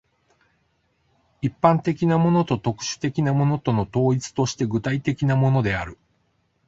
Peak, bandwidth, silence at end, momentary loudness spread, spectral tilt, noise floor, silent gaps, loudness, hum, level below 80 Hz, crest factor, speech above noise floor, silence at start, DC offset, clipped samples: -2 dBFS; 7.8 kHz; 0.75 s; 7 LU; -6.5 dB/octave; -68 dBFS; none; -22 LUFS; none; -50 dBFS; 20 dB; 47 dB; 1.45 s; under 0.1%; under 0.1%